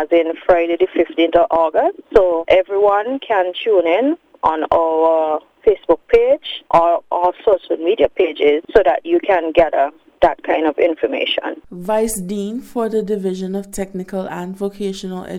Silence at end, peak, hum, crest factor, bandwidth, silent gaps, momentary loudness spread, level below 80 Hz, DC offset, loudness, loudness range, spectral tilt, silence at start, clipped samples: 0 s; 0 dBFS; none; 16 dB; 15.5 kHz; none; 10 LU; -44 dBFS; under 0.1%; -17 LUFS; 6 LU; -5 dB/octave; 0 s; under 0.1%